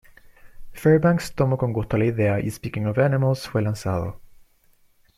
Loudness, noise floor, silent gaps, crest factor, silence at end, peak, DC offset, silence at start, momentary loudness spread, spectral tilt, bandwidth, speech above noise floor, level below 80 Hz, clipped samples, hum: -22 LUFS; -59 dBFS; none; 18 dB; 0.95 s; -6 dBFS; under 0.1%; 0.45 s; 9 LU; -7.5 dB/octave; 15 kHz; 37 dB; -46 dBFS; under 0.1%; none